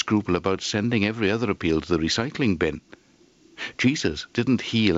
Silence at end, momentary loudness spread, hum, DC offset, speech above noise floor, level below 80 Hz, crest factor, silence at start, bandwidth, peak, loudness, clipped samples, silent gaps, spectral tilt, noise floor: 0 s; 4 LU; none; under 0.1%; 33 dB; -48 dBFS; 18 dB; 0 s; 8 kHz; -6 dBFS; -24 LUFS; under 0.1%; none; -5 dB/octave; -57 dBFS